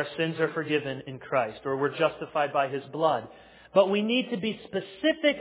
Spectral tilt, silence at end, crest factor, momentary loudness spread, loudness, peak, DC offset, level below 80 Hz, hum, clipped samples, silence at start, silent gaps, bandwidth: -9 dB/octave; 0 s; 20 dB; 9 LU; -28 LUFS; -8 dBFS; under 0.1%; -68 dBFS; none; under 0.1%; 0 s; none; 4 kHz